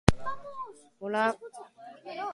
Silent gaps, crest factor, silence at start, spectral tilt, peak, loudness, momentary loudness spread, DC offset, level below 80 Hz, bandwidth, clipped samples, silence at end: none; 30 dB; 0.05 s; -6 dB/octave; 0 dBFS; -33 LUFS; 19 LU; under 0.1%; -44 dBFS; 11.5 kHz; under 0.1%; 0 s